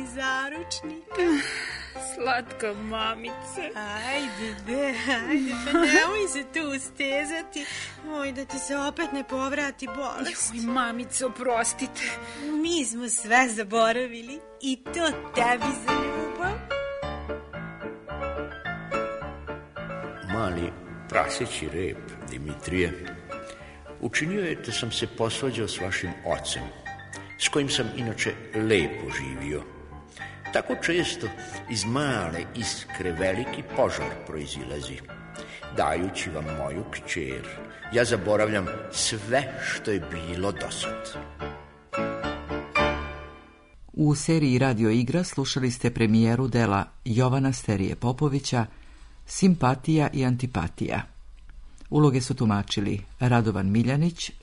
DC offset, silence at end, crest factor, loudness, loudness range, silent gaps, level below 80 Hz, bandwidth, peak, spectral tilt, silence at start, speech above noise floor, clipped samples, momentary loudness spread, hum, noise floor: under 0.1%; 0 s; 22 dB; -27 LUFS; 6 LU; none; -48 dBFS; 11 kHz; -6 dBFS; -4.5 dB/octave; 0 s; 23 dB; under 0.1%; 14 LU; none; -50 dBFS